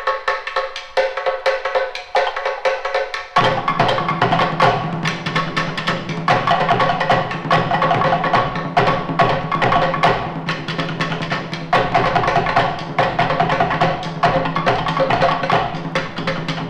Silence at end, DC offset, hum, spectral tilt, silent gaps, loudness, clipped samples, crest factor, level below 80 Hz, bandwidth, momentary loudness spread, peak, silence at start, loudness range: 0 s; under 0.1%; none; -5.5 dB/octave; none; -18 LUFS; under 0.1%; 18 dB; -42 dBFS; 11 kHz; 6 LU; 0 dBFS; 0 s; 2 LU